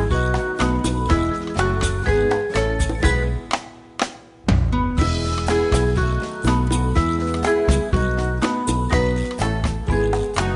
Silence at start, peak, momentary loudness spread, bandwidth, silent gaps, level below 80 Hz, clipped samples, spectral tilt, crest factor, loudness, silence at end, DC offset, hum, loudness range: 0 s; -4 dBFS; 4 LU; 11.5 kHz; none; -24 dBFS; under 0.1%; -6 dB/octave; 16 dB; -21 LUFS; 0 s; under 0.1%; none; 2 LU